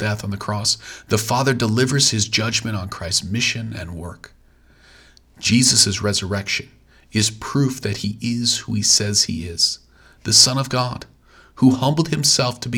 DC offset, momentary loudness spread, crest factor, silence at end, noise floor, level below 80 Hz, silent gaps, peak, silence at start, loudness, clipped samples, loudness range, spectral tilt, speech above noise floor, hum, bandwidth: under 0.1%; 13 LU; 20 dB; 0 s; -52 dBFS; -50 dBFS; none; 0 dBFS; 0 s; -18 LUFS; under 0.1%; 4 LU; -3 dB/octave; 33 dB; none; over 20 kHz